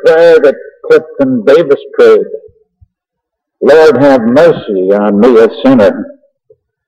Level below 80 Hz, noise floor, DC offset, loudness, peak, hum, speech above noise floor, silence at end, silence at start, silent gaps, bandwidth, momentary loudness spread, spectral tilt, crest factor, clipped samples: -48 dBFS; -75 dBFS; under 0.1%; -7 LUFS; 0 dBFS; none; 69 dB; 0.8 s; 0 s; none; 9 kHz; 9 LU; -7 dB/octave; 8 dB; 0.5%